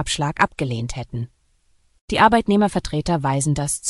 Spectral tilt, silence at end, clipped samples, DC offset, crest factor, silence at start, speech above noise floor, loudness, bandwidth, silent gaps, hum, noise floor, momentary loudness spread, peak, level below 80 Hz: -4.5 dB/octave; 0 s; under 0.1%; under 0.1%; 20 dB; 0 s; 42 dB; -20 LUFS; 13.5 kHz; 2.01-2.08 s; none; -62 dBFS; 14 LU; 0 dBFS; -40 dBFS